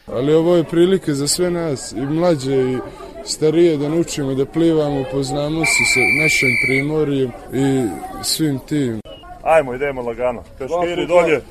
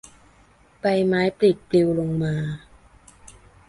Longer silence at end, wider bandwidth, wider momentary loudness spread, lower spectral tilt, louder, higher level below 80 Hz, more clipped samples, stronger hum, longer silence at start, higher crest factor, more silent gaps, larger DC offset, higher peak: second, 0 s vs 1.1 s; first, 15 kHz vs 11.5 kHz; about the same, 11 LU vs 9 LU; second, -4.5 dB/octave vs -7.5 dB/octave; first, -17 LUFS vs -22 LUFS; first, -42 dBFS vs -54 dBFS; neither; neither; second, 0.05 s vs 0.85 s; about the same, 16 dB vs 18 dB; neither; neither; first, -2 dBFS vs -6 dBFS